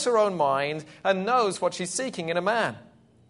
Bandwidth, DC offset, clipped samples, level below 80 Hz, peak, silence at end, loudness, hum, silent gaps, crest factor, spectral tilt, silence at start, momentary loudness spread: 11 kHz; under 0.1%; under 0.1%; -72 dBFS; -8 dBFS; 0.45 s; -26 LUFS; none; none; 18 dB; -3.5 dB/octave; 0 s; 7 LU